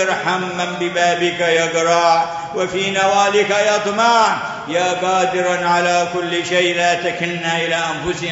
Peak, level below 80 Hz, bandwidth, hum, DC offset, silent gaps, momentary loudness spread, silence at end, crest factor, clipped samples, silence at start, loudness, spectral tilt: -2 dBFS; -54 dBFS; 8 kHz; none; under 0.1%; none; 7 LU; 0 s; 14 dB; under 0.1%; 0 s; -16 LUFS; -3 dB/octave